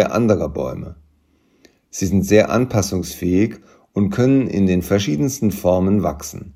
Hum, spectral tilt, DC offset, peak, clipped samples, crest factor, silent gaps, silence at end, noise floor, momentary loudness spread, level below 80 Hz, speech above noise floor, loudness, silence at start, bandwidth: none; -6 dB/octave; under 0.1%; 0 dBFS; under 0.1%; 18 dB; none; 0.05 s; -59 dBFS; 12 LU; -44 dBFS; 41 dB; -18 LUFS; 0 s; 16 kHz